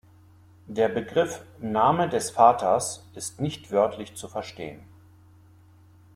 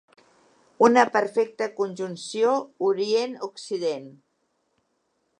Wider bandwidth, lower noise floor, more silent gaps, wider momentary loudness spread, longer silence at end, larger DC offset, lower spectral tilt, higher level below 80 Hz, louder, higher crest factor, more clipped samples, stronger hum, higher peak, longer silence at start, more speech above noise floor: first, 15.5 kHz vs 10 kHz; second, -54 dBFS vs -73 dBFS; neither; first, 17 LU vs 13 LU; about the same, 1.3 s vs 1.3 s; neither; about the same, -4.5 dB/octave vs -4.5 dB/octave; first, -62 dBFS vs -80 dBFS; about the same, -25 LUFS vs -24 LUFS; about the same, 24 dB vs 24 dB; neither; neither; about the same, -4 dBFS vs -2 dBFS; about the same, 0.7 s vs 0.8 s; second, 29 dB vs 49 dB